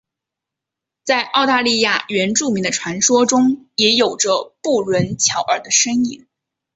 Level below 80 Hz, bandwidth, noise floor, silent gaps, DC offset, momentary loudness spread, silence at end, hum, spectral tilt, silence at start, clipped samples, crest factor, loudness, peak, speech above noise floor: -58 dBFS; 8.2 kHz; -84 dBFS; none; under 0.1%; 6 LU; 0.6 s; none; -2.5 dB/octave; 1.05 s; under 0.1%; 16 dB; -16 LUFS; -2 dBFS; 67 dB